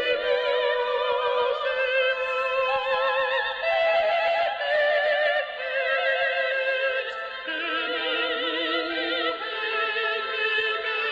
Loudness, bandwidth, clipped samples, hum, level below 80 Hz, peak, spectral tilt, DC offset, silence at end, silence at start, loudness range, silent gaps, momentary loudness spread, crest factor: -24 LUFS; 8 kHz; under 0.1%; none; -64 dBFS; -12 dBFS; -2.5 dB/octave; under 0.1%; 0 s; 0 s; 3 LU; none; 5 LU; 12 dB